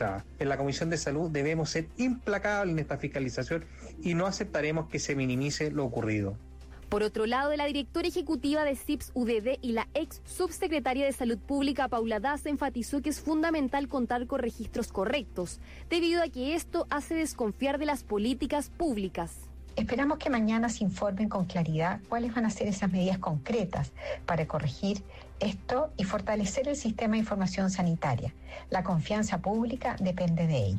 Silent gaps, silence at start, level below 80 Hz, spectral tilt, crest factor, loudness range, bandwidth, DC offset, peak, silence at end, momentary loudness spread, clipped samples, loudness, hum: none; 0 s; -48 dBFS; -5.5 dB/octave; 12 dB; 2 LU; 15.5 kHz; under 0.1%; -18 dBFS; 0 s; 6 LU; under 0.1%; -31 LUFS; none